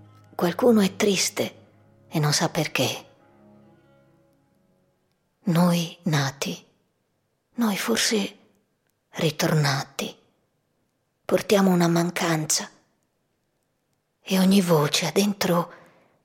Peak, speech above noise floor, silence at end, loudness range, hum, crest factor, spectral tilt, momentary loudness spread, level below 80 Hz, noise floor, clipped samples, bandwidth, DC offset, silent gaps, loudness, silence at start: -6 dBFS; 51 dB; 0.5 s; 4 LU; none; 18 dB; -4.5 dB/octave; 14 LU; -68 dBFS; -73 dBFS; under 0.1%; 17 kHz; under 0.1%; none; -23 LUFS; 0.4 s